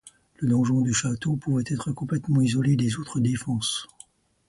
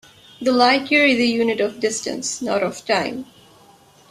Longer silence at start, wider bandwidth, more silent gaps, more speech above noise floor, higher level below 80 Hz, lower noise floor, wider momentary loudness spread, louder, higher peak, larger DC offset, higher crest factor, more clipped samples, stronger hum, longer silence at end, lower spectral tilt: second, 0.05 s vs 0.4 s; second, 11.5 kHz vs 14 kHz; neither; about the same, 30 dB vs 31 dB; first, -56 dBFS vs -62 dBFS; first, -54 dBFS vs -50 dBFS; second, 7 LU vs 10 LU; second, -25 LUFS vs -19 LUFS; second, -12 dBFS vs -2 dBFS; neither; about the same, 14 dB vs 18 dB; neither; neither; second, 0.65 s vs 0.85 s; first, -5.5 dB/octave vs -3 dB/octave